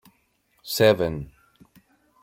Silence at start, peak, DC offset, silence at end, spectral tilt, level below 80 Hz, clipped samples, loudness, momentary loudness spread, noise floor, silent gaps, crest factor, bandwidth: 0.65 s; -6 dBFS; under 0.1%; 1 s; -5 dB/octave; -54 dBFS; under 0.1%; -22 LUFS; 24 LU; -67 dBFS; none; 22 dB; 16.5 kHz